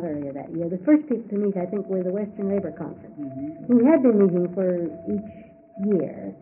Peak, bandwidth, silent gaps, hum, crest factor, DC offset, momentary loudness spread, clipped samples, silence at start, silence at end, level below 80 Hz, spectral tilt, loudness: -6 dBFS; 2.9 kHz; none; none; 16 dB; under 0.1%; 16 LU; under 0.1%; 0 s; 0.05 s; -64 dBFS; -7.5 dB/octave; -23 LUFS